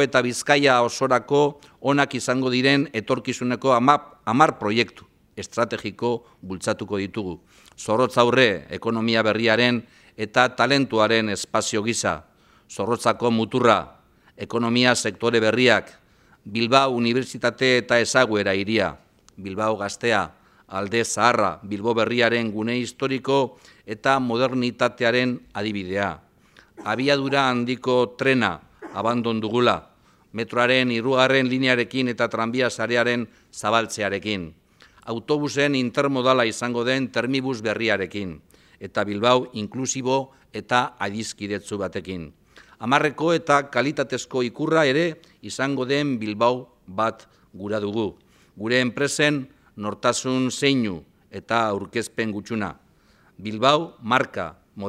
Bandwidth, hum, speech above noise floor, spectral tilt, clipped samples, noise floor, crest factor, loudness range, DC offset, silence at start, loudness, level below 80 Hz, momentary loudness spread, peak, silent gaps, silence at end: 13.5 kHz; none; 35 dB; -4.5 dB/octave; under 0.1%; -57 dBFS; 22 dB; 4 LU; under 0.1%; 0 s; -22 LUFS; -60 dBFS; 13 LU; 0 dBFS; none; 0 s